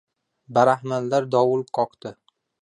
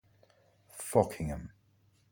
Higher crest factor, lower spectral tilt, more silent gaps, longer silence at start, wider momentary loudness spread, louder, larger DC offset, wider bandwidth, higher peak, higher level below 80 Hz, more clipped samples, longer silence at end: second, 18 dB vs 24 dB; about the same, -6.5 dB/octave vs -6 dB/octave; neither; second, 0.5 s vs 0.75 s; second, 12 LU vs 22 LU; first, -22 LUFS vs -33 LUFS; neither; second, 10.5 kHz vs 19.5 kHz; first, -4 dBFS vs -12 dBFS; second, -70 dBFS vs -52 dBFS; neither; second, 0.5 s vs 0.65 s